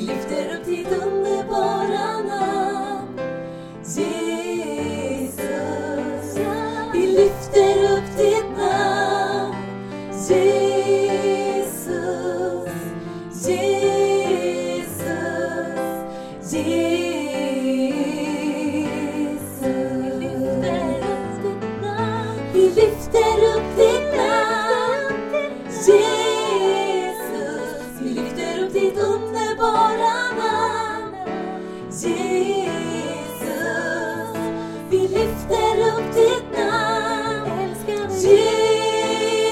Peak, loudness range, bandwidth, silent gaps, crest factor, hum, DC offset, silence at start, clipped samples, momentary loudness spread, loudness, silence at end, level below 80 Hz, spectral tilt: -2 dBFS; 6 LU; 15.5 kHz; none; 20 dB; none; under 0.1%; 0 s; under 0.1%; 11 LU; -21 LUFS; 0 s; -48 dBFS; -4.5 dB/octave